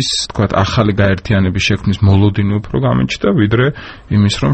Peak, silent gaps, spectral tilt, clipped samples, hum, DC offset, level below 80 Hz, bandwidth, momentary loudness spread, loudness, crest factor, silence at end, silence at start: 0 dBFS; none; -6 dB/octave; under 0.1%; none; under 0.1%; -34 dBFS; 8.8 kHz; 4 LU; -14 LUFS; 12 dB; 0 s; 0 s